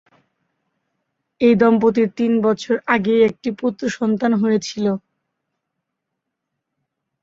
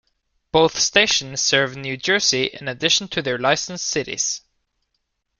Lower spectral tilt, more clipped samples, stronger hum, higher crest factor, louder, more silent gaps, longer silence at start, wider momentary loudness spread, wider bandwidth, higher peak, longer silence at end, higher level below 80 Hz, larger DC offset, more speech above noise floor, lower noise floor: first, -6 dB/octave vs -1.5 dB/octave; neither; neither; about the same, 18 dB vs 20 dB; about the same, -18 LUFS vs -19 LUFS; neither; first, 1.4 s vs 0.55 s; about the same, 8 LU vs 8 LU; second, 7.6 kHz vs 11 kHz; about the same, -2 dBFS vs 0 dBFS; first, 2.25 s vs 1 s; second, -60 dBFS vs -54 dBFS; neither; first, 62 dB vs 54 dB; first, -79 dBFS vs -74 dBFS